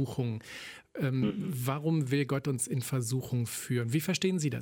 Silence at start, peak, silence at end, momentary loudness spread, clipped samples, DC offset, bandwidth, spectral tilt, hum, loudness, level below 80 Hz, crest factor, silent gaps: 0 s; -16 dBFS; 0 s; 7 LU; under 0.1%; under 0.1%; 17.5 kHz; -5.5 dB/octave; none; -32 LUFS; -66 dBFS; 16 dB; none